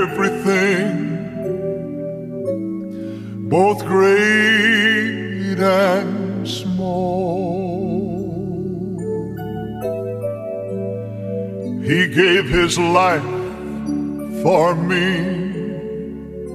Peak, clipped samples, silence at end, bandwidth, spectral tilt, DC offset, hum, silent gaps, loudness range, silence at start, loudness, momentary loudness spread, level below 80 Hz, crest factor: 0 dBFS; under 0.1%; 0 s; 15 kHz; -5.5 dB/octave; under 0.1%; none; none; 9 LU; 0 s; -19 LUFS; 14 LU; -44 dBFS; 18 dB